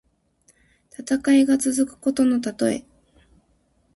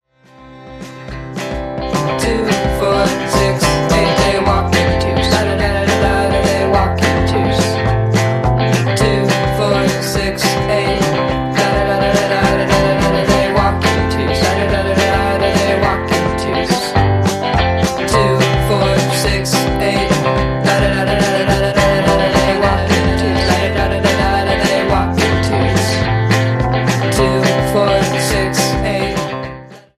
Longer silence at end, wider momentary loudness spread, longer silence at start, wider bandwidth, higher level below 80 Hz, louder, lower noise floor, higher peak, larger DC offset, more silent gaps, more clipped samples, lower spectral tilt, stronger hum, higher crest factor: first, 1.15 s vs 0.2 s; first, 9 LU vs 3 LU; first, 1 s vs 0.4 s; second, 11.5 kHz vs 15 kHz; second, -60 dBFS vs -26 dBFS; second, -21 LUFS vs -14 LUFS; first, -64 dBFS vs -42 dBFS; second, -8 dBFS vs 0 dBFS; neither; neither; neither; about the same, -4 dB/octave vs -5 dB/octave; neither; about the same, 16 dB vs 14 dB